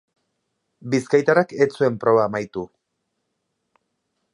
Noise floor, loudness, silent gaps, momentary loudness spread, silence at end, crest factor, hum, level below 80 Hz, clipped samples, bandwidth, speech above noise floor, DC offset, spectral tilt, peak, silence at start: -76 dBFS; -20 LUFS; none; 15 LU; 1.7 s; 20 dB; none; -64 dBFS; under 0.1%; 11 kHz; 57 dB; under 0.1%; -6.5 dB/octave; -2 dBFS; 0.85 s